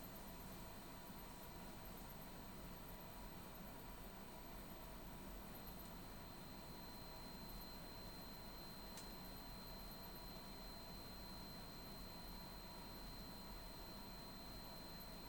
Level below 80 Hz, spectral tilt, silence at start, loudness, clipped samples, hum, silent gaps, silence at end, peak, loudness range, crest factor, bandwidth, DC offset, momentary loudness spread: -60 dBFS; -4 dB/octave; 0 s; -54 LUFS; under 0.1%; none; none; 0 s; -40 dBFS; 1 LU; 14 dB; over 20 kHz; under 0.1%; 1 LU